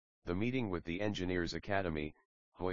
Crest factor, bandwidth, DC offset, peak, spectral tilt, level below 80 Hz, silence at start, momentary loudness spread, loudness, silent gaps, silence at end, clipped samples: 20 dB; 7.4 kHz; 0.2%; -18 dBFS; -5 dB/octave; -56 dBFS; 0.2 s; 6 LU; -38 LUFS; 2.25-2.52 s; 0 s; under 0.1%